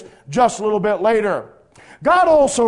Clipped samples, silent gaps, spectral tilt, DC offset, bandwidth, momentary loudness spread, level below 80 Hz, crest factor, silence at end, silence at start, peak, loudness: under 0.1%; none; -4.5 dB/octave; under 0.1%; 11 kHz; 10 LU; -50 dBFS; 16 dB; 0 s; 0 s; -2 dBFS; -17 LUFS